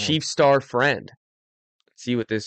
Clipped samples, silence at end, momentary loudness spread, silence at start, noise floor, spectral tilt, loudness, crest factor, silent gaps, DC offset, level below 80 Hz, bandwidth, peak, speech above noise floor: under 0.1%; 0 s; 10 LU; 0 s; under -90 dBFS; -4.5 dB/octave; -21 LUFS; 16 dB; 1.17-1.79 s; under 0.1%; -64 dBFS; 9 kHz; -8 dBFS; over 69 dB